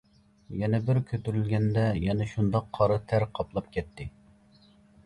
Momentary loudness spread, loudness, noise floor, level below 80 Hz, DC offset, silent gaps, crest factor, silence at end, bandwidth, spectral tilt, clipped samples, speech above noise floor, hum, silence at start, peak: 11 LU; -28 LUFS; -59 dBFS; -48 dBFS; under 0.1%; none; 18 dB; 0.95 s; 10 kHz; -9 dB/octave; under 0.1%; 31 dB; none; 0.5 s; -10 dBFS